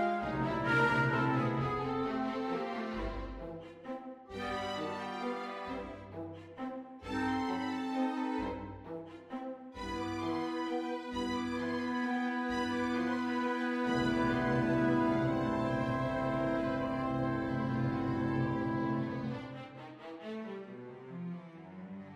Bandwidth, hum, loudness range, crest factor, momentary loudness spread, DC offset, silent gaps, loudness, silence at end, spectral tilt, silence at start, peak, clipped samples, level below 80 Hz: 11.5 kHz; none; 8 LU; 16 dB; 15 LU; under 0.1%; none; -35 LUFS; 0 s; -7 dB/octave; 0 s; -18 dBFS; under 0.1%; -56 dBFS